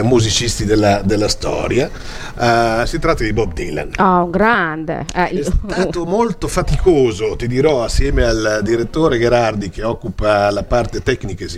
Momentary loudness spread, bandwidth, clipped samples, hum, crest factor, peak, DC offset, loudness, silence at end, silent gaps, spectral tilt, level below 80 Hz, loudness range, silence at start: 8 LU; 15 kHz; under 0.1%; none; 16 dB; 0 dBFS; under 0.1%; -16 LUFS; 0 s; none; -5 dB/octave; -26 dBFS; 1 LU; 0 s